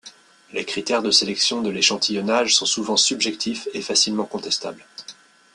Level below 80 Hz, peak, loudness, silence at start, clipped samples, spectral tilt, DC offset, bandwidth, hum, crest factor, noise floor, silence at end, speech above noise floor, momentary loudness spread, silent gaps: -66 dBFS; -2 dBFS; -20 LUFS; 0.05 s; under 0.1%; -1.5 dB/octave; under 0.1%; 12 kHz; none; 20 dB; -47 dBFS; 0.4 s; 25 dB; 13 LU; none